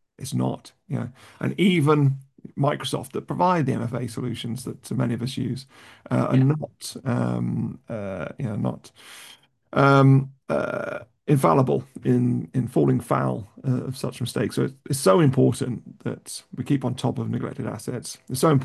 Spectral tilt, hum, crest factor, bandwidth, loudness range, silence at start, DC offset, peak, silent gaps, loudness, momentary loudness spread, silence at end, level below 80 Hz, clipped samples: -7 dB/octave; none; 20 dB; 12.5 kHz; 5 LU; 0.2 s; under 0.1%; -4 dBFS; none; -24 LUFS; 15 LU; 0 s; -56 dBFS; under 0.1%